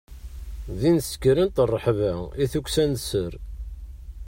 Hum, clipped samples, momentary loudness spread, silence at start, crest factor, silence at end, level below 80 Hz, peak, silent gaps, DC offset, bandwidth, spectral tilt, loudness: none; under 0.1%; 19 LU; 0.1 s; 16 dB; 0 s; -38 dBFS; -8 dBFS; none; under 0.1%; 16.5 kHz; -6 dB/octave; -24 LUFS